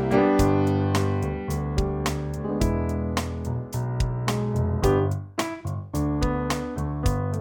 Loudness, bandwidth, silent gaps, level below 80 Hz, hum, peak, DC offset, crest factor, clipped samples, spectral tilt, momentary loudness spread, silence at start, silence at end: -26 LUFS; 17.5 kHz; none; -34 dBFS; none; -6 dBFS; under 0.1%; 18 dB; under 0.1%; -6.5 dB/octave; 9 LU; 0 s; 0 s